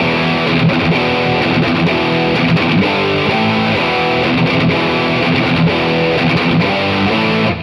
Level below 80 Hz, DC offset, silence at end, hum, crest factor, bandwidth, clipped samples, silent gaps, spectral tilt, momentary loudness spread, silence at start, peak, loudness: -40 dBFS; under 0.1%; 0 s; none; 12 dB; 11.5 kHz; under 0.1%; none; -7 dB/octave; 1 LU; 0 s; -2 dBFS; -13 LUFS